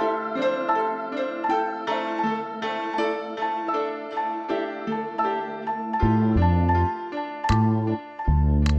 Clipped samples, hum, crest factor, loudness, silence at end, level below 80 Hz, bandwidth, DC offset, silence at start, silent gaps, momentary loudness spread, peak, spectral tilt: under 0.1%; none; 16 dB; -25 LUFS; 0 s; -32 dBFS; 8.4 kHz; under 0.1%; 0 s; none; 8 LU; -8 dBFS; -8 dB/octave